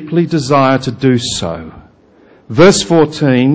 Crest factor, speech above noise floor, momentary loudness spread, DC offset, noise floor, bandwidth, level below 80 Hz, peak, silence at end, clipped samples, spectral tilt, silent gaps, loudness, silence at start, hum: 12 dB; 34 dB; 11 LU; under 0.1%; -45 dBFS; 8 kHz; -42 dBFS; 0 dBFS; 0 s; 0.1%; -5.5 dB/octave; none; -11 LUFS; 0 s; none